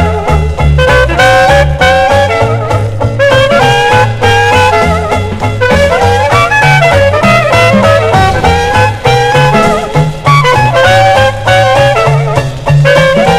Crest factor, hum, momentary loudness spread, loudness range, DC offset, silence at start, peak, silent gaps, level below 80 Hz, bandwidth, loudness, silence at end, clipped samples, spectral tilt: 6 dB; none; 5 LU; 1 LU; under 0.1%; 0 s; 0 dBFS; none; -20 dBFS; 15.5 kHz; -7 LUFS; 0 s; 3%; -5.5 dB/octave